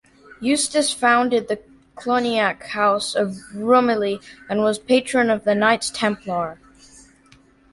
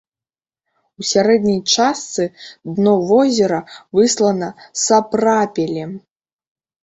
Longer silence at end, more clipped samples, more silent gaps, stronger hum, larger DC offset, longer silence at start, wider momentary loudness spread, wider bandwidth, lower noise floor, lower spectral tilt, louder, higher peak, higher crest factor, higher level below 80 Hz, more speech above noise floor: first, 1.2 s vs 0.85 s; neither; neither; neither; neither; second, 0.4 s vs 1 s; about the same, 10 LU vs 12 LU; first, 11.5 kHz vs 8.2 kHz; second, -53 dBFS vs under -90 dBFS; about the same, -3.5 dB/octave vs -4 dB/octave; second, -20 LUFS vs -16 LUFS; about the same, -4 dBFS vs -2 dBFS; about the same, 18 dB vs 16 dB; about the same, -58 dBFS vs -58 dBFS; second, 33 dB vs over 74 dB